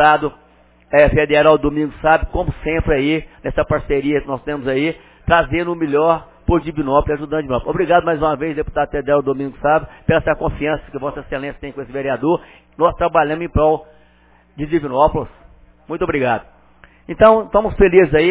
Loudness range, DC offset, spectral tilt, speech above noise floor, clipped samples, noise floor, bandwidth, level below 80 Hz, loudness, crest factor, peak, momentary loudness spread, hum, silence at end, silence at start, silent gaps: 4 LU; under 0.1%; -10.5 dB/octave; 35 dB; under 0.1%; -51 dBFS; 4 kHz; -32 dBFS; -17 LUFS; 16 dB; 0 dBFS; 12 LU; none; 0 s; 0 s; none